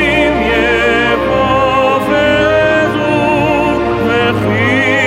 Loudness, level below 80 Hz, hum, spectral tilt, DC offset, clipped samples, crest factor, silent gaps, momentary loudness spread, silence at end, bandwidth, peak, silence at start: -11 LUFS; -30 dBFS; none; -6 dB/octave; under 0.1%; under 0.1%; 12 dB; none; 2 LU; 0 s; 16 kHz; 0 dBFS; 0 s